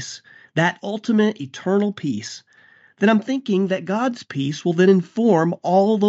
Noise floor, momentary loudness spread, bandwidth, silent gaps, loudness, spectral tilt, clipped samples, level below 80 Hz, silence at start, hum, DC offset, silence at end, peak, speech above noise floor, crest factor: -53 dBFS; 11 LU; 8 kHz; none; -20 LUFS; -5.5 dB/octave; under 0.1%; -72 dBFS; 0 s; none; under 0.1%; 0 s; -4 dBFS; 33 dB; 16 dB